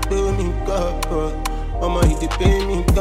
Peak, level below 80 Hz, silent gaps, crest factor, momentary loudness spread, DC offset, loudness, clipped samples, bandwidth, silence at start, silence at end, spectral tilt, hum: -4 dBFS; -22 dBFS; none; 14 dB; 6 LU; under 0.1%; -21 LUFS; under 0.1%; 15.5 kHz; 0 s; 0 s; -6 dB/octave; none